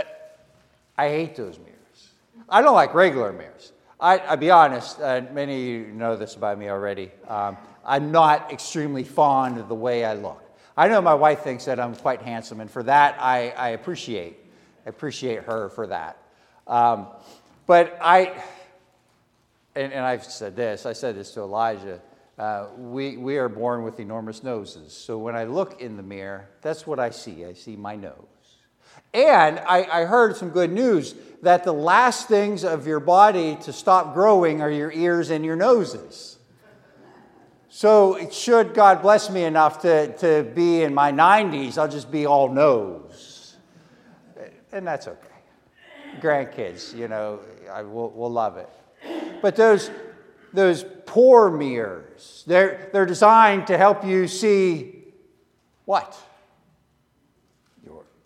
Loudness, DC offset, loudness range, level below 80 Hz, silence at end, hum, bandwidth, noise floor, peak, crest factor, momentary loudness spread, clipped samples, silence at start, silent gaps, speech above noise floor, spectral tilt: -20 LUFS; under 0.1%; 12 LU; -72 dBFS; 0.3 s; none; 12.5 kHz; -65 dBFS; 0 dBFS; 20 dB; 20 LU; under 0.1%; 0 s; none; 44 dB; -5 dB/octave